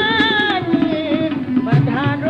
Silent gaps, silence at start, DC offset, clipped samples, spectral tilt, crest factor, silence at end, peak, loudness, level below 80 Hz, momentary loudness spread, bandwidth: none; 0 s; under 0.1%; under 0.1%; -7.5 dB/octave; 14 dB; 0 s; -4 dBFS; -17 LUFS; -48 dBFS; 5 LU; 7.2 kHz